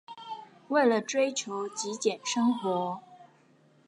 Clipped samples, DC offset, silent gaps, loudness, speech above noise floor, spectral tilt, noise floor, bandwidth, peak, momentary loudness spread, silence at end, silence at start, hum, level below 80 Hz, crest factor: under 0.1%; under 0.1%; none; -29 LUFS; 34 dB; -3.5 dB/octave; -62 dBFS; 11 kHz; -12 dBFS; 17 LU; 0.65 s; 0.1 s; none; -86 dBFS; 18 dB